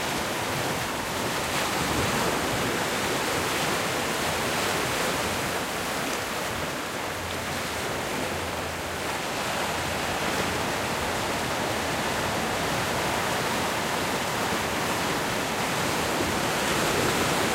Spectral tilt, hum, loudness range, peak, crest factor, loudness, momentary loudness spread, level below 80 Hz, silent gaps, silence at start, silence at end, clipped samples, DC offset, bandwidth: -3 dB/octave; none; 3 LU; -12 dBFS; 14 dB; -26 LUFS; 4 LU; -48 dBFS; none; 0 s; 0 s; under 0.1%; under 0.1%; 16 kHz